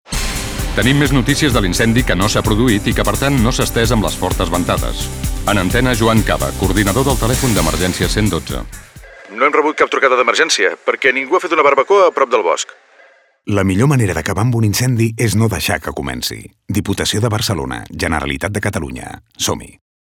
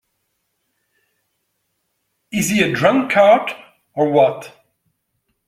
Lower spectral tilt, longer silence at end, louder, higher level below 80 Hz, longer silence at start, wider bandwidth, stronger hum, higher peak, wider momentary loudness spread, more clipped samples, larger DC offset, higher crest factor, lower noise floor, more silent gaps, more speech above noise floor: about the same, -4.5 dB/octave vs -4.5 dB/octave; second, 0.35 s vs 1 s; about the same, -15 LUFS vs -16 LUFS; first, -26 dBFS vs -58 dBFS; second, 0.1 s vs 2.35 s; first, over 20 kHz vs 15.5 kHz; neither; about the same, 0 dBFS vs -2 dBFS; second, 10 LU vs 20 LU; neither; neither; about the same, 14 dB vs 18 dB; second, -48 dBFS vs -71 dBFS; neither; second, 33 dB vs 56 dB